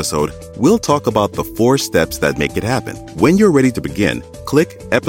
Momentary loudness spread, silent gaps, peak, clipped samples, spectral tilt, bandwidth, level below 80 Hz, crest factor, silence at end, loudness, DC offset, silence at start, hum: 8 LU; none; 0 dBFS; under 0.1%; -5.5 dB/octave; 17 kHz; -38 dBFS; 14 dB; 0 s; -16 LUFS; under 0.1%; 0 s; none